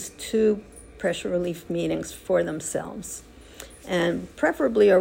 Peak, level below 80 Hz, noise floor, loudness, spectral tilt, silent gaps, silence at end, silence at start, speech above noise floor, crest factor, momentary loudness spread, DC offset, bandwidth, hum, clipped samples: -8 dBFS; -52 dBFS; -45 dBFS; -25 LUFS; -5 dB/octave; none; 0 s; 0 s; 21 dB; 18 dB; 15 LU; under 0.1%; 16 kHz; none; under 0.1%